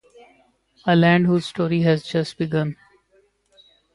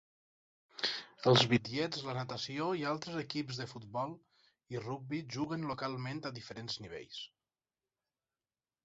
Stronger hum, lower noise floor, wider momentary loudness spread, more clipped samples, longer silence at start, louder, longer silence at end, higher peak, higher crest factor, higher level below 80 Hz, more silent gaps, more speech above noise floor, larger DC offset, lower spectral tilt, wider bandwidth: neither; second, -61 dBFS vs under -90 dBFS; second, 12 LU vs 16 LU; neither; about the same, 0.85 s vs 0.75 s; first, -20 LUFS vs -36 LUFS; second, 1.2 s vs 1.6 s; first, -4 dBFS vs -12 dBFS; second, 18 dB vs 26 dB; first, -58 dBFS vs -72 dBFS; neither; second, 42 dB vs over 54 dB; neither; first, -7.5 dB/octave vs -4 dB/octave; first, 11 kHz vs 8 kHz